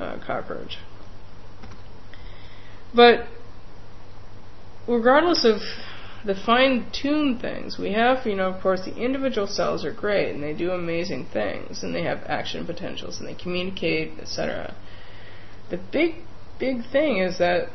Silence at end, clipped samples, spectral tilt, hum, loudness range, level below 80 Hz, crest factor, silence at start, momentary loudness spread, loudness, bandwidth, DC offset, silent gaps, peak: 0 s; under 0.1%; -5 dB/octave; none; 7 LU; -46 dBFS; 22 dB; 0 s; 22 LU; -24 LUFS; 6.2 kHz; 3%; none; -2 dBFS